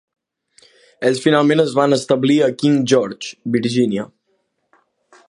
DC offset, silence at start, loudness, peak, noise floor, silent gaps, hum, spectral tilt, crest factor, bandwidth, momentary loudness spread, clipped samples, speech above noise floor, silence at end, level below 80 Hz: under 0.1%; 1 s; -17 LUFS; 0 dBFS; -67 dBFS; none; none; -5.5 dB/octave; 18 dB; 11.5 kHz; 10 LU; under 0.1%; 52 dB; 1.2 s; -64 dBFS